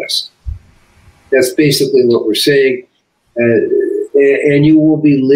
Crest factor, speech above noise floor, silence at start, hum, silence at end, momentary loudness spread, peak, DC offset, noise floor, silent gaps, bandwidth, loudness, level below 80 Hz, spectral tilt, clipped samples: 10 dB; 36 dB; 0 s; none; 0 s; 13 LU; 0 dBFS; under 0.1%; -46 dBFS; none; 16 kHz; -11 LUFS; -38 dBFS; -5.5 dB/octave; under 0.1%